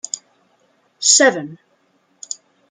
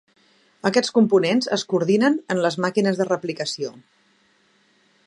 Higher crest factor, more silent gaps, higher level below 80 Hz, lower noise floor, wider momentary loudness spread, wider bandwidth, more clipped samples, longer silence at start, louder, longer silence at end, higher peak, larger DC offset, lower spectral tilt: about the same, 20 dB vs 20 dB; neither; about the same, -72 dBFS vs -74 dBFS; about the same, -61 dBFS vs -61 dBFS; first, 21 LU vs 9 LU; about the same, 11 kHz vs 11 kHz; neither; second, 0.15 s vs 0.65 s; first, -13 LUFS vs -21 LUFS; second, 1.15 s vs 1.3 s; about the same, 0 dBFS vs -2 dBFS; neither; second, -0.5 dB/octave vs -5 dB/octave